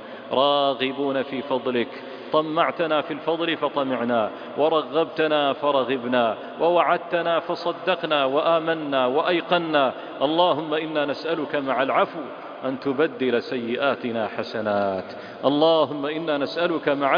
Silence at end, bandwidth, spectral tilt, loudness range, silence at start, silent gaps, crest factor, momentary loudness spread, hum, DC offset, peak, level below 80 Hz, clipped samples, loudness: 0 s; 5.2 kHz; -7 dB/octave; 3 LU; 0 s; none; 18 dB; 7 LU; none; under 0.1%; -4 dBFS; -70 dBFS; under 0.1%; -23 LUFS